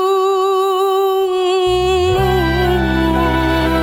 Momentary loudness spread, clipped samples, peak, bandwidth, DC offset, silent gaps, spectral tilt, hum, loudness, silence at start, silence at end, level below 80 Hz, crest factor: 1 LU; under 0.1%; -2 dBFS; 17 kHz; under 0.1%; none; -6 dB/octave; none; -15 LUFS; 0 s; 0 s; -26 dBFS; 12 dB